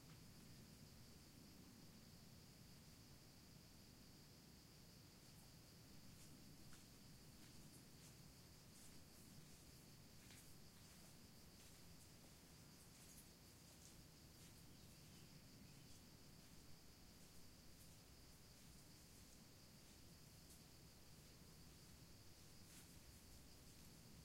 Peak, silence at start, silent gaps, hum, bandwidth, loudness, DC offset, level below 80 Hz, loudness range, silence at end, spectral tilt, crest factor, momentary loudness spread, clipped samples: -48 dBFS; 0 s; none; none; 16 kHz; -64 LUFS; under 0.1%; -74 dBFS; 1 LU; 0 s; -3.5 dB/octave; 16 dB; 2 LU; under 0.1%